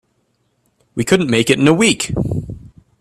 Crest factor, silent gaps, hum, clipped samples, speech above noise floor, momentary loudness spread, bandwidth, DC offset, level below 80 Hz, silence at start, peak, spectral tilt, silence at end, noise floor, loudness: 18 dB; none; none; under 0.1%; 50 dB; 17 LU; 14.5 kHz; under 0.1%; -40 dBFS; 0.95 s; 0 dBFS; -4.5 dB/octave; 0.35 s; -64 dBFS; -15 LUFS